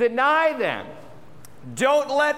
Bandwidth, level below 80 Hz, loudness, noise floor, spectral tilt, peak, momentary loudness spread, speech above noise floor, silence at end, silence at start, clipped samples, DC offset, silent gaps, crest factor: 16 kHz; -66 dBFS; -21 LUFS; -48 dBFS; -3.5 dB/octave; -8 dBFS; 16 LU; 27 dB; 0 s; 0 s; under 0.1%; under 0.1%; none; 14 dB